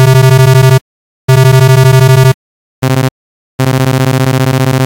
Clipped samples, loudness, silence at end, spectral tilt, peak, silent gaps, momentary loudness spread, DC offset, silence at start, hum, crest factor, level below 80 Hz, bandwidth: under 0.1%; -8 LUFS; 0 s; -6 dB/octave; 0 dBFS; 0.81-1.28 s, 2.34-2.82 s, 3.11-3.58 s; 11 LU; under 0.1%; 0 s; none; 6 dB; -36 dBFS; 17 kHz